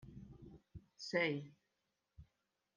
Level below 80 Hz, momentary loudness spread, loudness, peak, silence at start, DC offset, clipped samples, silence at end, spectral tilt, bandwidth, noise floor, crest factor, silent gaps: -70 dBFS; 23 LU; -40 LUFS; -24 dBFS; 0 s; under 0.1%; under 0.1%; 0.55 s; -5 dB/octave; 9.8 kHz; -87 dBFS; 22 dB; none